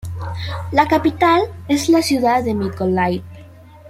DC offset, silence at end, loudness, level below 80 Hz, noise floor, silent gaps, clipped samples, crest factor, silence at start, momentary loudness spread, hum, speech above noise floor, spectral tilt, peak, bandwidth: under 0.1%; 0 s; -17 LUFS; -46 dBFS; -41 dBFS; none; under 0.1%; 16 dB; 0.05 s; 12 LU; none; 24 dB; -5.5 dB/octave; -2 dBFS; 16 kHz